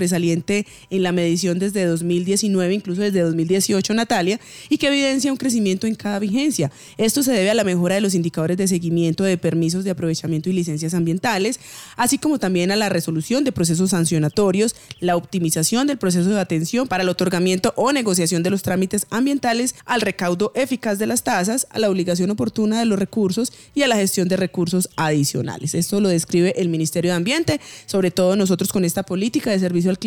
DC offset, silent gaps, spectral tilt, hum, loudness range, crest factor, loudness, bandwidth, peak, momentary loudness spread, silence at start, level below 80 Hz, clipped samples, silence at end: under 0.1%; none; -5 dB/octave; none; 1 LU; 16 dB; -20 LUFS; 18 kHz; -4 dBFS; 4 LU; 0 s; -56 dBFS; under 0.1%; 0 s